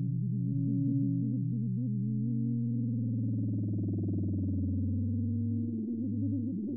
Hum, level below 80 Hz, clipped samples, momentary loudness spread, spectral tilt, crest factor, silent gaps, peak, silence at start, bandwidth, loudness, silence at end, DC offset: none; -68 dBFS; under 0.1%; 3 LU; -19 dB/octave; 10 dB; none; -22 dBFS; 0 s; 0.8 kHz; -32 LUFS; 0 s; under 0.1%